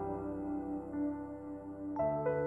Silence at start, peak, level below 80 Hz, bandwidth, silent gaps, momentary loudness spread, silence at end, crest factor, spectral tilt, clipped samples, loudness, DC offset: 0 s; -22 dBFS; -60 dBFS; 2.8 kHz; none; 10 LU; 0 s; 16 dB; -11 dB/octave; under 0.1%; -39 LUFS; under 0.1%